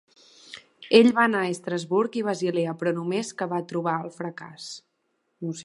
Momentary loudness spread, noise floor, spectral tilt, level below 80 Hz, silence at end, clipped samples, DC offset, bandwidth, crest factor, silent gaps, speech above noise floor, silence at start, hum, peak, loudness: 21 LU; -74 dBFS; -5 dB/octave; -76 dBFS; 0 s; under 0.1%; under 0.1%; 11.5 kHz; 24 dB; none; 50 dB; 0.5 s; none; -2 dBFS; -24 LUFS